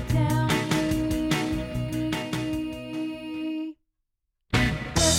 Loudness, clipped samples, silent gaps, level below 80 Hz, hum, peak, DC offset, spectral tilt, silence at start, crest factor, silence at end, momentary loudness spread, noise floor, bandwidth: -27 LUFS; under 0.1%; none; -40 dBFS; none; -8 dBFS; under 0.1%; -4.5 dB/octave; 0 s; 18 dB; 0 s; 9 LU; -79 dBFS; 17 kHz